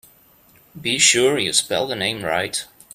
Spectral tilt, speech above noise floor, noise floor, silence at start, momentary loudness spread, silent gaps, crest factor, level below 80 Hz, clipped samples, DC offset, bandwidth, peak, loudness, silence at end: -1.5 dB/octave; 33 dB; -53 dBFS; 0.75 s; 12 LU; none; 22 dB; -60 dBFS; under 0.1%; under 0.1%; 15.5 kHz; 0 dBFS; -18 LUFS; 0.3 s